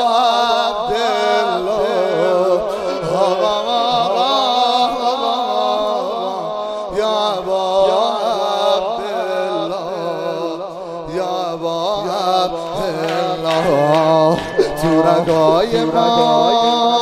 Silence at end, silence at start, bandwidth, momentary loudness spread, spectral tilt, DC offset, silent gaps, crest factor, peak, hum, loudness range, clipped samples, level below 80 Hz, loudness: 0 s; 0 s; 15 kHz; 8 LU; -5 dB/octave; under 0.1%; none; 16 dB; 0 dBFS; none; 6 LU; under 0.1%; -48 dBFS; -16 LUFS